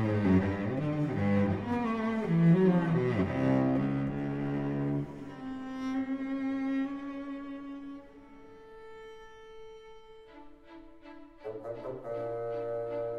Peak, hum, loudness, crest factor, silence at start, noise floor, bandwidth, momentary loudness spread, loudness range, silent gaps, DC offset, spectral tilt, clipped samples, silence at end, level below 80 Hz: -14 dBFS; none; -31 LUFS; 16 dB; 0 s; -52 dBFS; 7 kHz; 23 LU; 21 LU; none; 0.1%; -9.5 dB/octave; under 0.1%; 0 s; -58 dBFS